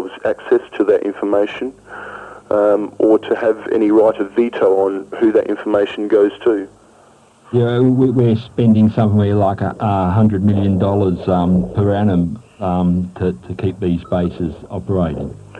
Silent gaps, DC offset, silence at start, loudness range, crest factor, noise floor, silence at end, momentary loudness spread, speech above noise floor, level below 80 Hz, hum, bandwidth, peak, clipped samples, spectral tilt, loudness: none; under 0.1%; 0 s; 3 LU; 12 dB; -48 dBFS; 0 s; 9 LU; 33 dB; -44 dBFS; none; 9.4 kHz; -4 dBFS; under 0.1%; -9.5 dB/octave; -16 LUFS